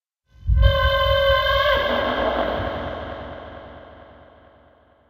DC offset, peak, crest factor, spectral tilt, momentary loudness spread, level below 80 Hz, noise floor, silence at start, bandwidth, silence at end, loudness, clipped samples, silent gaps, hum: under 0.1%; -4 dBFS; 18 dB; -6.5 dB/octave; 19 LU; -28 dBFS; -55 dBFS; 0.45 s; 15.5 kHz; 1.05 s; -20 LUFS; under 0.1%; none; none